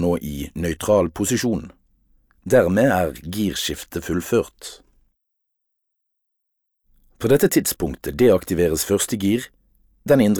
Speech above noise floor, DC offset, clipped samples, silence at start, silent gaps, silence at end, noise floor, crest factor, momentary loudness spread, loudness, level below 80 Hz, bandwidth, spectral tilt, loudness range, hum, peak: 57 dB; under 0.1%; under 0.1%; 0 s; none; 0 s; -77 dBFS; 18 dB; 13 LU; -20 LUFS; -44 dBFS; over 20 kHz; -5 dB/octave; 8 LU; none; -4 dBFS